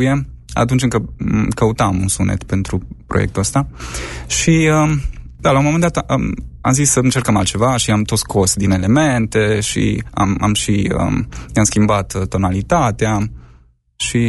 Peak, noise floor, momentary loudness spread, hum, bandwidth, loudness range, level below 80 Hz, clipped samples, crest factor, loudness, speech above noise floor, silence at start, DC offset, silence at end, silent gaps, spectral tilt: -2 dBFS; -48 dBFS; 8 LU; none; 12 kHz; 3 LU; -32 dBFS; under 0.1%; 14 dB; -16 LUFS; 33 dB; 0 s; under 0.1%; 0 s; none; -5 dB/octave